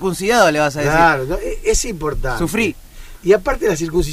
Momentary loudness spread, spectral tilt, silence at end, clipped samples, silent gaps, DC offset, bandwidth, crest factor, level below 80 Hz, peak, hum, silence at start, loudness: 9 LU; -4.5 dB/octave; 0 s; under 0.1%; none; under 0.1%; 16 kHz; 14 dB; -28 dBFS; -2 dBFS; none; 0 s; -17 LUFS